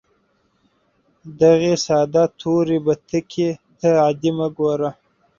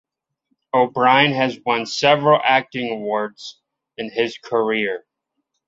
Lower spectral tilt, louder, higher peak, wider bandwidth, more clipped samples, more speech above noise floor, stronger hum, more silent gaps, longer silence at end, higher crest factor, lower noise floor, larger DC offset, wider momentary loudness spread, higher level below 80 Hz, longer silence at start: first, -6 dB/octave vs -4.5 dB/octave; about the same, -19 LUFS vs -18 LUFS; about the same, -2 dBFS vs 0 dBFS; about the same, 7.4 kHz vs 7.8 kHz; neither; second, 46 dB vs 58 dB; neither; neither; second, 0.45 s vs 0.7 s; about the same, 16 dB vs 20 dB; second, -64 dBFS vs -76 dBFS; neither; second, 8 LU vs 15 LU; first, -58 dBFS vs -66 dBFS; first, 1.25 s vs 0.75 s